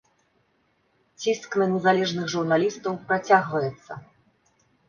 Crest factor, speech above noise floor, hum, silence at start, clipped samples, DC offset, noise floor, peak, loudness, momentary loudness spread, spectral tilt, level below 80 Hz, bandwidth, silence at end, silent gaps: 22 dB; 44 dB; none; 1.2 s; under 0.1%; under 0.1%; -68 dBFS; -4 dBFS; -24 LUFS; 11 LU; -5 dB/octave; -68 dBFS; 7.2 kHz; 0.9 s; none